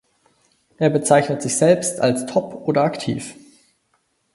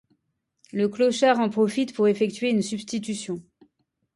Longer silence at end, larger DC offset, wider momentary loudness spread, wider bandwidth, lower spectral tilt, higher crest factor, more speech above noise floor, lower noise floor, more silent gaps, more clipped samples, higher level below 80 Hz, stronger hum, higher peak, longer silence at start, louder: first, 1 s vs 0.75 s; neither; about the same, 10 LU vs 11 LU; about the same, 11.5 kHz vs 11.5 kHz; about the same, -5 dB/octave vs -5 dB/octave; about the same, 20 dB vs 18 dB; second, 48 dB vs 53 dB; second, -67 dBFS vs -76 dBFS; neither; neither; first, -62 dBFS vs -70 dBFS; neither; first, 0 dBFS vs -8 dBFS; about the same, 0.8 s vs 0.75 s; first, -19 LUFS vs -24 LUFS